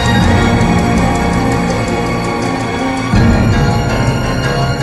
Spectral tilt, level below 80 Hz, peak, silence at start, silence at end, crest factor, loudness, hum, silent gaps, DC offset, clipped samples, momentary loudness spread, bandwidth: -6 dB/octave; -22 dBFS; 0 dBFS; 0 s; 0 s; 12 dB; -13 LUFS; none; none; under 0.1%; under 0.1%; 5 LU; 13 kHz